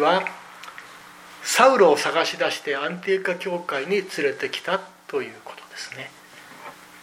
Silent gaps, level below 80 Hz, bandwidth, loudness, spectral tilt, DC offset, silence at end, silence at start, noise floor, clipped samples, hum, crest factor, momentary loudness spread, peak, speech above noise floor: none; -76 dBFS; 16.5 kHz; -22 LUFS; -3 dB/octave; under 0.1%; 0 s; 0 s; -44 dBFS; under 0.1%; none; 22 dB; 24 LU; -2 dBFS; 22 dB